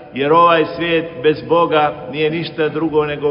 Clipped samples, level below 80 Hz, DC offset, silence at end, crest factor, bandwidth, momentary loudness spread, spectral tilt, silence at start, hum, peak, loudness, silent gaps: under 0.1%; -50 dBFS; under 0.1%; 0 s; 16 dB; 5.4 kHz; 8 LU; -10 dB/octave; 0 s; none; 0 dBFS; -15 LUFS; none